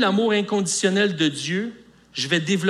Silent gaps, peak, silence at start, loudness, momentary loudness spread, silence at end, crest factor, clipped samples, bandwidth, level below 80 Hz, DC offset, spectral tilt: none; -6 dBFS; 0 s; -22 LUFS; 9 LU; 0 s; 16 dB; under 0.1%; 13 kHz; -66 dBFS; under 0.1%; -4 dB/octave